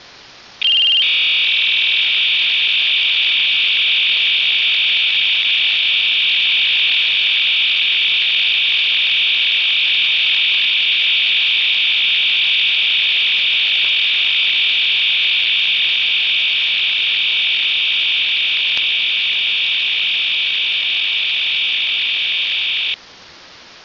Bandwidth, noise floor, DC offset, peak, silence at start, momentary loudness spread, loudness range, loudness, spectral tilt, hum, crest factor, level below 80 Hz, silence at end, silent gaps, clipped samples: 6 kHz; -41 dBFS; under 0.1%; -2 dBFS; 0.6 s; 3 LU; 2 LU; -12 LUFS; 1.5 dB/octave; none; 12 dB; -64 dBFS; 0.2 s; none; under 0.1%